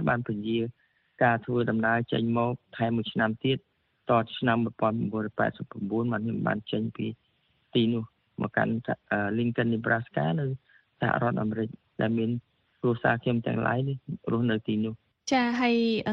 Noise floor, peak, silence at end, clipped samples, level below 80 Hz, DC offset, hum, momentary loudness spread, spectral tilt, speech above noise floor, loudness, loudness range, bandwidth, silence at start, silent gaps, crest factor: -63 dBFS; -10 dBFS; 0 s; under 0.1%; -62 dBFS; under 0.1%; none; 8 LU; -7 dB/octave; 36 dB; -28 LUFS; 2 LU; 7 kHz; 0 s; none; 18 dB